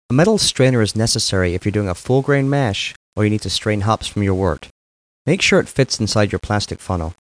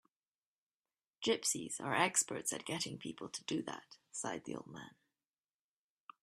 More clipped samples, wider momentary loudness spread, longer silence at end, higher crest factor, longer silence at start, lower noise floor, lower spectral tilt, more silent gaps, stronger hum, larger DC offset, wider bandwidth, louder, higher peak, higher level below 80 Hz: neither; second, 9 LU vs 16 LU; second, 0.2 s vs 1.35 s; second, 14 dB vs 26 dB; second, 0.1 s vs 1.2 s; about the same, under -90 dBFS vs under -90 dBFS; first, -4.5 dB/octave vs -2 dB/octave; first, 2.96-3.12 s, 4.71-5.25 s vs none; neither; neither; second, 10.5 kHz vs 14 kHz; first, -18 LUFS vs -38 LUFS; first, -4 dBFS vs -16 dBFS; first, -40 dBFS vs -82 dBFS